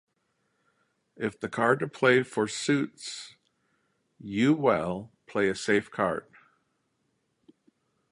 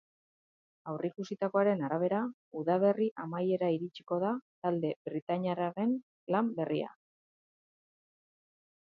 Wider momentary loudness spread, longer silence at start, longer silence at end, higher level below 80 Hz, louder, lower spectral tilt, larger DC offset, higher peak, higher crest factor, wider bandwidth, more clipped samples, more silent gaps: first, 15 LU vs 9 LU; first, 1.2 s vs 0.85 s; second, 1.9 s vs 2.1 s; first, -66 dBFS vs -84 dBFS; first, -27 LUFS vs -33 LUFS; second, -5 dB/octave vs -8.5 dB/octave; neither; first, -8 dBFS vs -16 dBFS; about the same, 22 dB vs 18 dB; first, 11.5 kHz vs 6.8 kHz; neither; second, none vs 2.34-2.51 s, 3.11-3.16 s, 4.42-4.62 s, 4.96-5.05 s, 5.22-5.27 s, 6.03-6.27 s